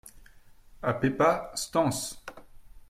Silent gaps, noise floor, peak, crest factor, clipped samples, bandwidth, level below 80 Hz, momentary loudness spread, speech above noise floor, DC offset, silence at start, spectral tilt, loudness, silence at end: none; -53 dBFS; -10 dBFS; 20 dB; under 0.1%; 16 kHz; -54 dBFS; 15 LU; 26 dB; under 0.1%; 0.05 s; -4.5 dB/octave; -28 LUFS; 0.05 s